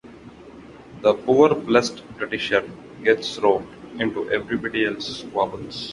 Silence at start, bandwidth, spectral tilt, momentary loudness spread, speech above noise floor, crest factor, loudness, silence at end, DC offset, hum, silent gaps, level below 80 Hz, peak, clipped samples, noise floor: 0.05 s; 11.5 kHz; -4.5 dB/octave; 13 LU; 21 dB; 20 dB; -22 LUFS; 0 s; under 0.1%; none; none; -56 dBFS; -2 dBFS; under 0.1%; -43 dBFS